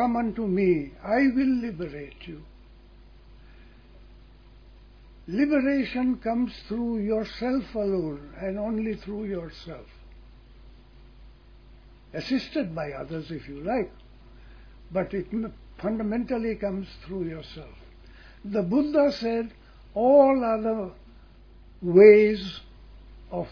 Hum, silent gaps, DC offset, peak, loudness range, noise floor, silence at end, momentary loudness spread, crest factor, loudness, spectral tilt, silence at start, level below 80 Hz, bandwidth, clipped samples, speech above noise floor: none; none; under 0.1%; -4 dBFS; 14 LU; -51 dBFS; 0 s; 17 LU; 24 dB; -25 LUFS; -8 dB/octave; 0 s; -50 dBFS; 5.4 kHz; under 0.1%; 26 dB